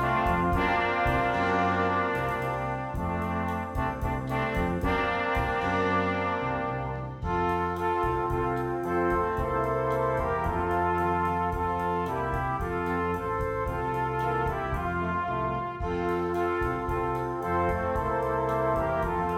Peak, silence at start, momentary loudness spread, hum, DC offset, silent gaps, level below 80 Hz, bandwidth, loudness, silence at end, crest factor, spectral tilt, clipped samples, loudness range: -12 dBFS; 0 s; 5 LU; none; under 0.1%; none; -40 dBFS; 16 kHz; -28 LUFS; 0 s; 16 dB; -7.5 dB/octave; under 0.1%; 2 LU